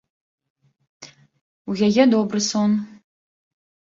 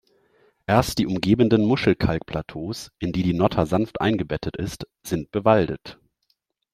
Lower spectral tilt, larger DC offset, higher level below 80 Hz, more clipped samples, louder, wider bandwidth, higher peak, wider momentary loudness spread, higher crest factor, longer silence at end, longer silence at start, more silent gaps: second, -5 dB/octave vs -6.5 dB/octave; neither; second, -66 dBFS vs -44 dBFS; neither; first, -19 LUFS vs -23 LUFS; second, 7.8 kHz vs 15 kHz; about the same, -2 dBFS vs -2 dBFS; first, 18 LU vs 13 LU; about the same, 20 dB vs 20 dB; first, 1.1 s vs 0.8 s; first, 1 s vs 0.7 s; first, 1.41-1.65 s vs none